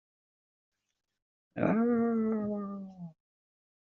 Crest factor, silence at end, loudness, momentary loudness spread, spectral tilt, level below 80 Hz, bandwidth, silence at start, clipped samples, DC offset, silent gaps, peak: 22 dB; 0.7 s; -31 LUFS; 19 LU; -9.5 dB/octave; -72 dBFS; 4 kHz; 1.55 s; under 0.1%; under 0.1%; none; -12 dBFS